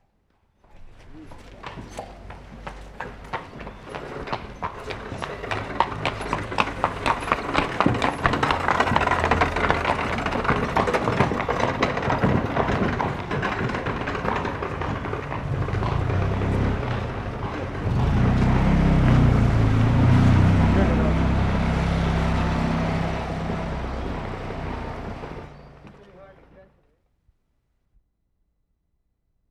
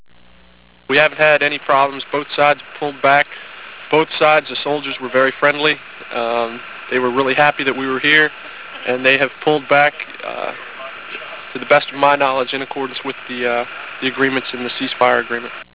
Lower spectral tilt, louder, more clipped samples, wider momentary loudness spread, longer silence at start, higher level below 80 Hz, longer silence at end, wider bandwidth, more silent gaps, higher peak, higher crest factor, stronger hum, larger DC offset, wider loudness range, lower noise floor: about the same, -7 dB/octave vs -7.5 dB/octave; second, -23 LUFS vs -16 LUFS; neither; about the same, 17 LU vs 15 LU; second, 0.75 s vs 0.9 s; first, -32 dBFS vs -60 dBFS; first, 2.9 s vs 0.1 s; first, 11.5 kHz vs 4 kHz; neither; about the same, -2 dBFS vs 0 dBFS; about the same, 22 dB vs 18 dB; neither; second, under 0.1% vs 0.4%; first, 16 LU vs 3 LU; first, -72 dBFS vs -49 dBFS